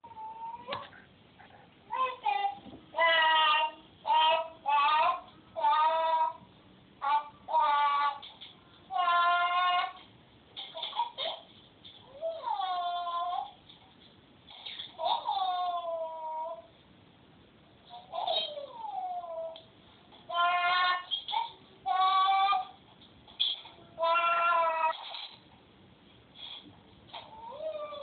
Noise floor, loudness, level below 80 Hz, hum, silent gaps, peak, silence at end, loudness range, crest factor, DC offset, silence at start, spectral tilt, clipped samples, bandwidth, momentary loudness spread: -59 dBFS; -30 LUFS; -74 dBFS; none; none; -14 dBFS; 0 s; 10 LU; 18 dB; under 0.1%; 0.05 s; 2.5 dB/octave; under 0.1%; 4.6 kHz; 20 LU